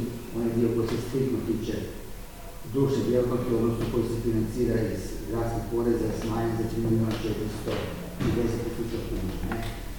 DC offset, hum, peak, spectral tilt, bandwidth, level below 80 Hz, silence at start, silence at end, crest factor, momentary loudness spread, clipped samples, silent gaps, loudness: under 0.1%; none; -10 dBFS; -7 dB/octave; 19 kHz; -40 dBFS; 0 s; 0 s; 16 dB; 8 LU; under 0.1%; none; -28 LUFS